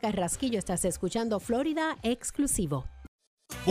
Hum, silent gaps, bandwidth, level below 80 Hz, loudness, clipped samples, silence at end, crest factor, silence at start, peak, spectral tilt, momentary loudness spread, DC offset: none; 3.08-3.19 s, 3.27-3.37 s; 15.5 kHz; -48 dBFS; -30 LUFS; under 0.1%; 0 s; 16 dB; 0.05 s; -14 dBFS; -4.5 dB/octave; 5 LU; under 0.1%